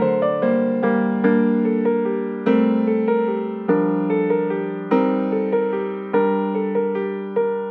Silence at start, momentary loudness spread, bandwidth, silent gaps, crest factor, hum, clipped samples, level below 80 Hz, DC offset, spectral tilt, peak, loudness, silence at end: 0 s; 5 LU; 4.5 kHz; none; 16 dB; none; under 0.1%; -68 dBFS; under 0.1%; -10.5 dB/octave; -4 dBFS; -20 LUFS; 0 s